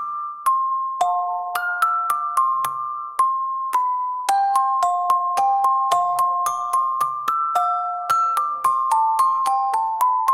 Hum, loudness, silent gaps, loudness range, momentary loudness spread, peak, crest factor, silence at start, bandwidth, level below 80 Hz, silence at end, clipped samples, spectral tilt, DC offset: none; -20 LUFS; none; 2 LU; 5 LU; -4 dBFS; 16 dB; 0 s; 17 kHz; -74 dBFS; 0 s; under 0.1%; -0.5 dB/octave; under 0.1%